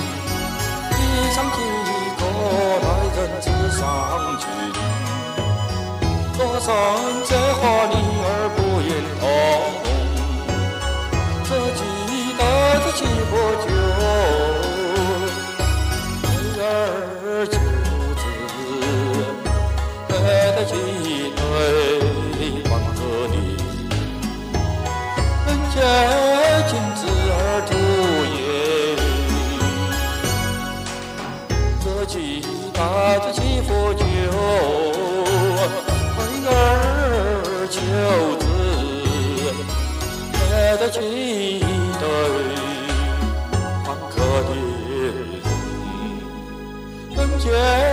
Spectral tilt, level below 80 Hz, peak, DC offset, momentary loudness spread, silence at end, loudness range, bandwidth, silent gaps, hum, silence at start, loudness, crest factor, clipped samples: -5 dB/octave; -28 dBFS; -2 dBFS; under 0.1%; 8 LU; 0 s; 4 LU; 15.5 kHz; none; none; 0 s; -20 LUFS; 18 dB; under 0.1%